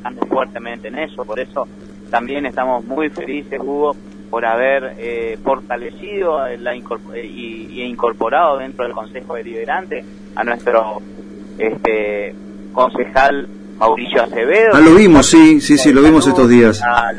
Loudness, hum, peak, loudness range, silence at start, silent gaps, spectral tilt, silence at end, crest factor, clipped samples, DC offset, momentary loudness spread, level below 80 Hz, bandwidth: -13 LUFS; none; 0 dBFS; 12 LU; 0 s; none; -5 dB/octave; 0 s; 14 dB; under 0.1%; under 0.1%; 20 LU; -40 dBFS; 10.5 kHz